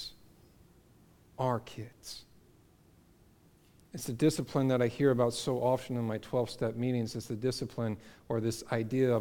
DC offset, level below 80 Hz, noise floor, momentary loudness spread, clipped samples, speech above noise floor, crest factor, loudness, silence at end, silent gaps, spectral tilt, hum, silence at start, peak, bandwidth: under 0.1%; -62 dBFS; -63 dBFS; 17 LU; under 0.1%; 31 dB; 18 dB; -32 LUFS; 0 s; none; -6 dB/octave; none; 0 s; -14 dBFS; 18 kHz